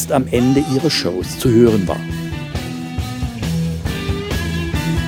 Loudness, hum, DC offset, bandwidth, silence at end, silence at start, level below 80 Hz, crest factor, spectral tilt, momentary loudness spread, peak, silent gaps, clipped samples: -18 LUFS; none; under 0.1%; 19.5 kHz; 0 s; 0 s; -32 dBFS; 18 dB; -6 dB/octave; 12 LU; 0 dBFS; none; under 0.1%